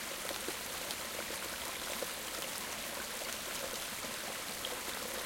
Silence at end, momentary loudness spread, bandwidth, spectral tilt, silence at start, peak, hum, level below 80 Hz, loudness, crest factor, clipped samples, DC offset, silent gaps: 0 s; 1 LU; 17 kHz; -1 dB/octave; 0 s; -16 dBFS; none; -64 dBFS; -39 LUFS; 24 dB; under 0.1%; under 0.1%; none